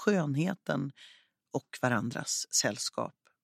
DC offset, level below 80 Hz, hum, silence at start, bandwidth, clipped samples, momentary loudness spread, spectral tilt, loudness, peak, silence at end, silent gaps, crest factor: under 0.1%; -78 dBFS; none; 0 s; 16 kHz; under 0.1%; 11 LU; -3.5 dB/octave; -32 LUFS; -12 dBFS; 0.35 s; none; 20 dB